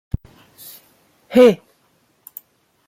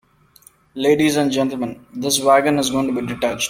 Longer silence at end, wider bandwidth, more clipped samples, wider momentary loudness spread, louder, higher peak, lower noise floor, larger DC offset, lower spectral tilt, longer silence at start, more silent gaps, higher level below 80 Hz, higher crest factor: first, 1.3 s vs 0 s; about the same, 16.5 kHz vs 16.5 kHz; neither; first, 27 LU vs 12 LU; first, -15 LUFS vs -18 LUFS; about the same, -2 dBFS vs -2 dBFS; first, -61 dBFS vs -51 dBFS; neither; first, -6.5 dB/octave vs -4 dB/octave; first, 1.3 s vs 0.75 s; neither; first, -44 dBFS vs -52 dBFS; about the same, 20 dB vs 16 dB